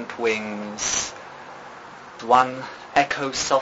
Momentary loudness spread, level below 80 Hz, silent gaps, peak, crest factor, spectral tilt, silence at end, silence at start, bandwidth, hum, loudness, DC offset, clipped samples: 21 LU; -58 dBFS; none; -2 dBFS; 22 dB; -2 dB/octave; 0 s; 0 s; 8 kHz; none; -22 LUFS; under 0.1%; under 0.1%